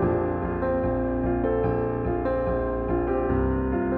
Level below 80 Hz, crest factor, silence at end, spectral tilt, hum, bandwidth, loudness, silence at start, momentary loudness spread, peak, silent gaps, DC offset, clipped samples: -34 dBFS; 12 dB; 0 s; -12 dB/octave; none; 4.3 kHz; -26 LUFS; 0 s; 2 LU; -12 dBFS; none; under 0.1%; under 0.1%